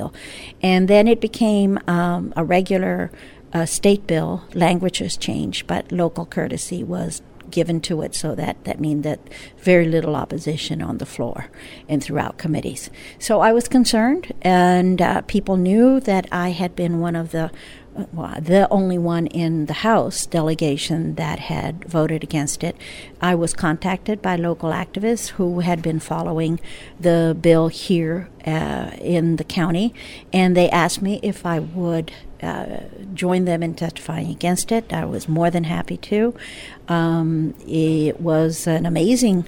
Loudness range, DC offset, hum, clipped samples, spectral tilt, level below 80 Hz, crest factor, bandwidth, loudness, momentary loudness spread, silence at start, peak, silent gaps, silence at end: 6 LU; under 0.1%; none; under 0.1%; -5.5 dB/octave; -44 dBFS; 18 dB; 17 kHz; -20 LUFS; 12 LU; 0 s; -2 dBFS; none; 0 s